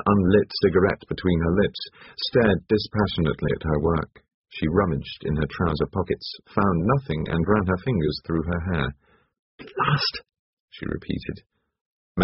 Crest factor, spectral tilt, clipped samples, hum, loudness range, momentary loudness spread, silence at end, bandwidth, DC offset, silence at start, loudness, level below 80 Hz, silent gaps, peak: 20 dB; -5.5 dB/octave; under 0.1%; none; 5 LU; 12 LU; 0 s; 6 kHz; under 0.1%; 0 s; -24 LUFS; -40 dBFS; 4.34-4.44 s, 9.39-9.58 s, 10.39-10.68 s, 11.46-11.50 s, 11.81-12.15 s; -4 dBFS